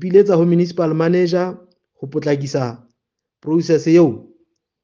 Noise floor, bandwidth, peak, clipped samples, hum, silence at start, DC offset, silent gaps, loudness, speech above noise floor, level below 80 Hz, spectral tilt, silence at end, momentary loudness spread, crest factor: -79 dBFS; 7.2 kHz; 0 dBFS; under 0.1%; none; 0 s; under 0.1%; none; -17 LUFS; 64 dB; -64 dBFS; -7.5 dB/octave; 0.6 s; 14 LU; 16 dB